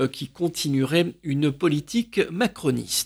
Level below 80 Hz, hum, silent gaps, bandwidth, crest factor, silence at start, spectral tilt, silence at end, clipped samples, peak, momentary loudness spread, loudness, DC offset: -58 dBFS; none; none; over 20 kHz; 16 dB; 0 s; -5 dB/octave; 0 s; under 0.1%; -8 dBFS; 5 LU; -24 LUFS; under 0.1%